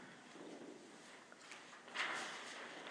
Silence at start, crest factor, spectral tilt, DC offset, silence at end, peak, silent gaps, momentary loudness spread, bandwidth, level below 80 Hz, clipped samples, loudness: 0 s; 22 dB; -1.5 dB/octave; under 0.1%; 0 s; -28 dBFS; none; 15 LU; 11 kHz; under -90 dBFS; under 0.1%; -49 LUFS